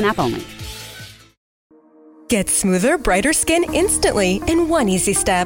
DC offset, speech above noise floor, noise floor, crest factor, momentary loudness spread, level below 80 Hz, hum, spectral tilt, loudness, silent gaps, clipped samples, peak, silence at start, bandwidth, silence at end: under 0.1%; 30 dB; -47 dBFS; 14 dB; 16 LU; -36 dBFS; none; -3.5 dB/octave; -17 LUFS; 1.37-1.70 s; under 0.1%; -4 dBFS; 0 s; 17 kHz; 0 s